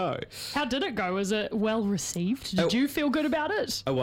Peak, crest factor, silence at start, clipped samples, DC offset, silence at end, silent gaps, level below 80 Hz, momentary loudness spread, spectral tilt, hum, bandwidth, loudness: -12 dBFS; 16 dB; 0 s; under 0.1%; under 0.1%; 0 s; none; -56 dBFS; 4 LU; -4.5 dB/octave; none; 17.5 kHz; -28 LUFS